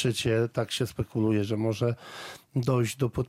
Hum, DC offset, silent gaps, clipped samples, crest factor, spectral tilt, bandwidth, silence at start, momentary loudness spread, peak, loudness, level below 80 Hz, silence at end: none; under 0.1%; none; under 0.1%; 16 dB; -6 dB/octave; 15.5 kHz; 0 s; 8 LU; -12 dBFS; -28 LUFS; -56 dBFS; 0.05 s